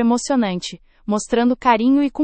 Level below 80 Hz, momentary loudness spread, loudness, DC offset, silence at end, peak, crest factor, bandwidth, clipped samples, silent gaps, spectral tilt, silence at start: -50 dBFS; 13 LU; -18 LUFS; under 0.1%; 0 s; -2 dBFS; 16 dB; 8.8 kHz; under 0.1%; none; -4.5 dB/octave; 0 s